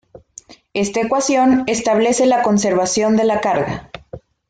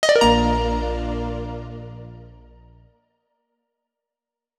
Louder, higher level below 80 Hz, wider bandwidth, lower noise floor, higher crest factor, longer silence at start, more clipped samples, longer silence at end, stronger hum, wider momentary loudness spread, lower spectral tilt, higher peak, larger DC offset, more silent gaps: first, -16 LUFS vs -21 LUFS; second, -50 dBFS vs -32 dBFS; second, 9.6 kHz vs 13.5 kHz; second, -43 dBFS vs -88 dBFS; second, 12 dB vs 20 dB; first, 0.75 s vs 0 s; neither; second, 0.3 s vs 2.3 s; neither; second, 11 LU vs 23 LU; about the same, -4 dB/octave vs -4.5 dB/octave; about the same, -4 dBFS vs -4 dBFS; neither; neither